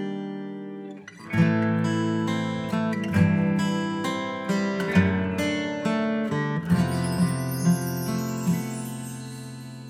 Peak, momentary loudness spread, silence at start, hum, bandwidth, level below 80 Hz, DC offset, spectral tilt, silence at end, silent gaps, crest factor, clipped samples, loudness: -8 dBFS; 14 LU; 0 s; none; 15.5 kHz; -56 dBFS; under 0.1%; -6.5 dB/octave; 0 s; none; 18 dB; under 0.1%; -25 LUFS